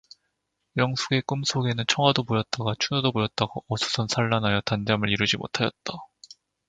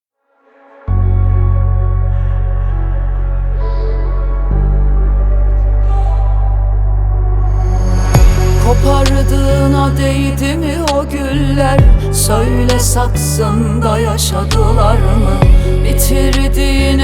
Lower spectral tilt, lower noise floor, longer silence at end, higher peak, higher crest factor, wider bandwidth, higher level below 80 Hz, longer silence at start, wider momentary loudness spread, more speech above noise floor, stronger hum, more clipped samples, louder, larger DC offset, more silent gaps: about the same, -4.5 dB/octave vs -5.5 dB/octave; first, -78 dBFS vs -55 dBFS; first, 0.65 s vs 0 s; about the same, -2 dBFS vs 0 dBFS; first, 24 dB vs 10 dB; second, 9.4 kHz vs 16 kHz; second, -56 dBFS vs -12 dBFS; about the same, 0.75 s vs 0.85 s; about the same, 7 LU vs 7 LU; first, 52 dB vs 45 dB; neither; neither; second, -25 LUFS vs -13 LUFS; neither; neither